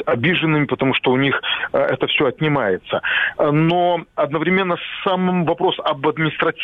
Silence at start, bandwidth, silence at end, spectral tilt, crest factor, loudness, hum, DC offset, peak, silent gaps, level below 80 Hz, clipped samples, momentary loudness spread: 0 s; 4.7 kHz; 0 s; -8.5 dB/octave; 16 dB; -18 LUFS; none; under 0.1%; -2 dBFS; none; -54 dBFS; under 0.1%; 4 LU